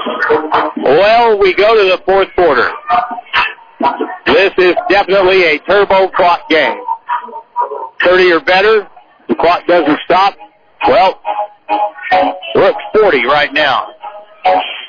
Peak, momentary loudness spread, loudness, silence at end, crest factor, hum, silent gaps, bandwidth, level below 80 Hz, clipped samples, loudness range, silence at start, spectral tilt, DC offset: 0 dBFS; 10 LU; -11 LUFS; 0 s; 12 dB; none; none; 5.4 kHz; -44 dBFS; under 0.1%; 2 LU; 0 s; -5.5 dB/octave; under 0.1%